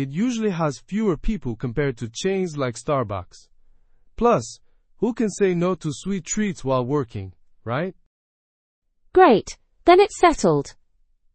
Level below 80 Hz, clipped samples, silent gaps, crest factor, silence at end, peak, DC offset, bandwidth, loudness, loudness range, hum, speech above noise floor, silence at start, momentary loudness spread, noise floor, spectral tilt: -42 dBFS; under 0.1%; 8.06-8.82 s; 22 dB; 0.65 s; 0 dBFS; under 0.1%; 8.8 kHz; -22 LUFS; 7 LU; none; 40 dB; 0 s; 15 LU; -61 dBFS; -5.5 dB/octave